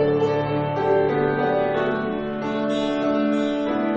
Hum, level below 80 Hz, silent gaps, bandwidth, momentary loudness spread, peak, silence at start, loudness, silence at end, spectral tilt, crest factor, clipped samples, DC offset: none; -52 dBFS; none; 8.2 kHz; 5 LU; -8 dBFS; 0 s; -22 LUFS; 0 s; -7.5 dB/octave; 12 dB; under 0.1%; under 0.1%